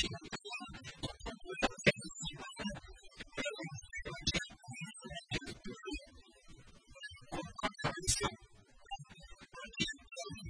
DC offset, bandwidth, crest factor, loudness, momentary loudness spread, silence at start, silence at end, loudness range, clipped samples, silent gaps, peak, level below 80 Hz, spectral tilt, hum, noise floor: under 0.1%; 10.5 kHz; 32 dB; -40 LUFS; 19 LU; 0 s; 0 s; 5 LU; under 0.1%; none; -12 dBFS; -56 dBFS; -3 dB/octave; none; -61 dBFS